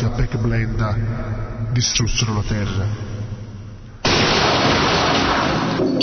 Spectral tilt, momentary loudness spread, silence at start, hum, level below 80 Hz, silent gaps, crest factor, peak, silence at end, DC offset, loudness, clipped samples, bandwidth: -4.5 dB/octave; 14 LU; 0 s; none; -30 dBFS; none; 16 dB; -4 dBFS; 0 s; under 0.1%; -19 LUFS; under 0.1%; 6.6 kHz